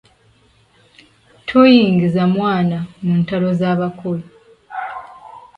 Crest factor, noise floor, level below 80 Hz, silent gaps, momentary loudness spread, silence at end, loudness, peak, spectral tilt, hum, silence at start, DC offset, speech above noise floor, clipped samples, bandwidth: 16 dB; -54 dBFS; -54 dBFS; none; 20 LU; 0.2 s; -16 LUFS; 0 dBFS; -8.5 dB/octave; none; 1.45 s; under 0.1%; 39 dB; under 0.1%; 5.6 kHz